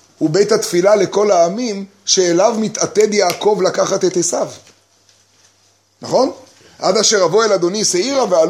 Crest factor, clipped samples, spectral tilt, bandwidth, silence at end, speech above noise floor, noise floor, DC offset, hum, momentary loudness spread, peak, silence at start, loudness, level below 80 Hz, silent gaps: 14 dB; under 0.1%; -3 dB/octave; 15.5 kHz; 0 s; 41 dB; -56 dBFS; under 0.1%; none; 8 LU; 0 dBFS; 0.2 s; -15 LUFS; -66 dBFS; none